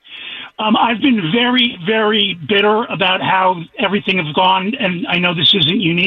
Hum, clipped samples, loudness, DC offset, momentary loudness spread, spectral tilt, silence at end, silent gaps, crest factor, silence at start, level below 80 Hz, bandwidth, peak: none; under 0.1%; -14 LUFS; under 0.1%; 7 LU; -7 dB/octave; 0 s; none; 12 dB; 0.1 s; -54 dBFS; 6.2 kHz; -2 dBFS